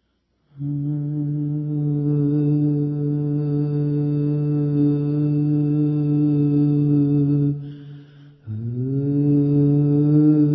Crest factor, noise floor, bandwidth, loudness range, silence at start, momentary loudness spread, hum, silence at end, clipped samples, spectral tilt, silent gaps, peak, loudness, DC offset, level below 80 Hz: 12 dB; -68 dBFS; 3.8 kHz; 3 LU; 0.55 s; 8 LU; none; 0 s; under 0.1%; -14.5 dB/octave; none; -8 dBFS; -20 LUFS; under 0.1%; -56 dBFS